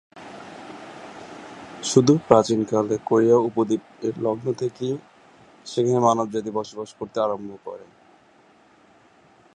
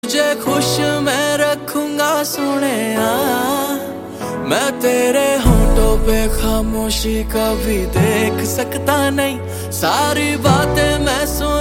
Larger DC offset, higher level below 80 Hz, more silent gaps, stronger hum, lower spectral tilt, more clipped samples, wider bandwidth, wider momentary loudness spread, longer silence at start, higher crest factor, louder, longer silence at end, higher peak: neither; second, -64 dBFS vs -24 dBFS; neither; neither; first, -6 dB/octave vs -4.5 dB/octave; neither; second, 11 kHz vs 17 kHz; first, 22 LU vs 5 LU; about the same, 0.15 s vs 0.05 s; first, 24 dB vs 16 dB; second, -22 LUFS vs -16 LUFS; first, 1.75 s vs 0 s; about the same, 0 dBFS vs 0 dBFS